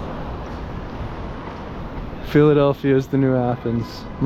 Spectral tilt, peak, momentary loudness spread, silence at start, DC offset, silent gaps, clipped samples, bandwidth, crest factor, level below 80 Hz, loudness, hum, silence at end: -8.5 dB/octave; -2 dBFS; 17 LU; 0 s; under 0.1%; none; under 0.1%; 13.5 kHz; 18 dB; -36 dBFS; -20 LUFS; none; 0 s